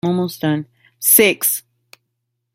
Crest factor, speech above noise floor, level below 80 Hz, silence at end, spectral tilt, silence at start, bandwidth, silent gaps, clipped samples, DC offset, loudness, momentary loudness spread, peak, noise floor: 18 dB; 58 dB; -62 dBFS; 0.95 s; -3.5 dB/octave; 0.05 s; 17 kHz; none; under 0.1%; under 0.1%; -15 LUFS; 13 LU; 0 dBFS; -74 dBFS